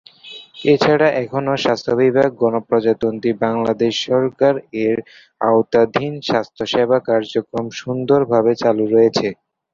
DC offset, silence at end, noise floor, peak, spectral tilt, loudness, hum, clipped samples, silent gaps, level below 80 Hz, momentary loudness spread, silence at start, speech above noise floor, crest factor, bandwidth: under 0.1%; 0.4 s; -39 dBFS; 0 dBFS; -6 dB/octave; -17 LUFS; none; under 0.1%; none; -56 dBFS; 8 LU; 0.25 s; 23 dB; 16 dB; 7.4 kHz